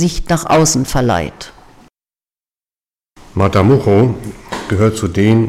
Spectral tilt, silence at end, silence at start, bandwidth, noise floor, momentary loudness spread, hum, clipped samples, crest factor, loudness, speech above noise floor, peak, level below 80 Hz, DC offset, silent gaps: -5.5 dB/octave; 0 s; 0 s; 15.5 kHz; under -90 dBFS; 15 LU; none; under 0.1%; 14 dB; -13 LUFS; over 78 dB; -2 dBFS; -32 dBFS; under 0.1%; none